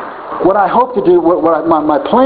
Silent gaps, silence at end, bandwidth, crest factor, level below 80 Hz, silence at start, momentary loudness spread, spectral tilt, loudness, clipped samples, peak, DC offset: none; 0 s; 4.7 kHz; 10 dB; -46 dBFS; 0 s; 3 LU; -10.5 dB/octave; -11 LUFS; under 0.1%; 0 dBFS; under 0.1%